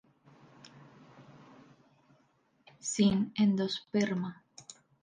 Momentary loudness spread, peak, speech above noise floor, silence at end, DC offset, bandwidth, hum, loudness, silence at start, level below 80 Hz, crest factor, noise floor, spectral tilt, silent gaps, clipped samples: 24 LU; -16 dBFS; 41 dB; 0.3 s; under 0.1%; 9.8 kHz; none; -31 LUFS; 1.2 s; -68 dBFS; 20 dB; -71 dBFS; -5 dB/octave; none; under 0.1%